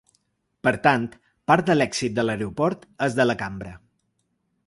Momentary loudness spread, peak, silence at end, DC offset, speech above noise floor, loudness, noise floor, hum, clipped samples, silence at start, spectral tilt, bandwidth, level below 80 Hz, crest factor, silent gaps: 14 LU; -2 dBFS; 0.9 s; under 0.1%; 50 dB; -23 LUFS; -73 dBFS; none; under 0.1%; 0.65 s; -5.5 dB/octave; 11.5 kHz; -56 dBFS; 22 dB; none